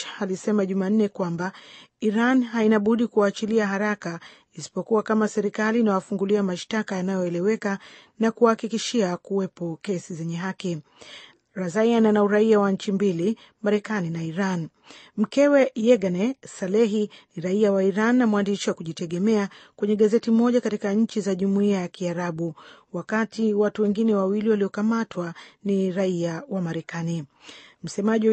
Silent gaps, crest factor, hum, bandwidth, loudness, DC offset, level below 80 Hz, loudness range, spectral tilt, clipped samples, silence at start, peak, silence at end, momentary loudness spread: none; 18 dB; none; 8.6 kHz; -24 LUFS; under 0.1%; -70 dBFS; 4 LU; -6.5 dB/octave; under 0.1%; 0 s; -6 dBFS; 0 s; 13 LU